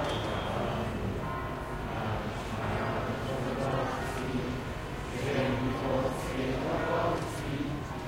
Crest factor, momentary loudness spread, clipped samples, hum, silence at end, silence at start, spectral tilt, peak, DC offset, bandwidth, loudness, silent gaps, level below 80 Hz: 16 dB; 6 LU; under 0.1%; none; 0 s; 0 s; -6 dB/octave; -16 dBFS; under 0.1%; 16 kHz; -33 LUFS; none; -44 dBFS